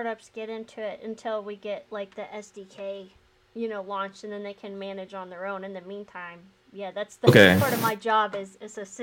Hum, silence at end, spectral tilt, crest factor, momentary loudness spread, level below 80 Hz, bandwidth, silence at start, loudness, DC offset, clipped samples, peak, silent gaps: none; 0 s; -5.5 dB/octave; 26 dB; 21 LU; -66 dBFS; 17 kHz; 0 s; -25 LUFS; under 0.1%; under 0.1%; -2 dBFS; none